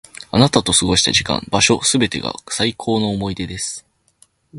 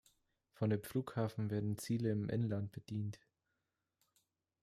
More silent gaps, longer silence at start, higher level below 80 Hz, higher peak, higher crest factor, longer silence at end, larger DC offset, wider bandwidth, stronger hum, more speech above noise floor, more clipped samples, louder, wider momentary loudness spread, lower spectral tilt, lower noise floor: neither; second, 0.2 s vs 0.6 s; first, -40 dBFS vs -74 dBFS; first, 0 dBFS vs -24 dBFS; about the same, 18 dB vs 16 dB; second, 0 s vs 1.45 s; neither; second, 11.5 kHz vs 15.5 kHz; neither; second, 38 dB vs 49 dB; neither; first, -17 LUFS vs -40 LUFS; first, 11 LU vs 7 LU; second, -3 dB/octave vs -7.5 dB/octave; second, -56 dBFS vs -88 dBFS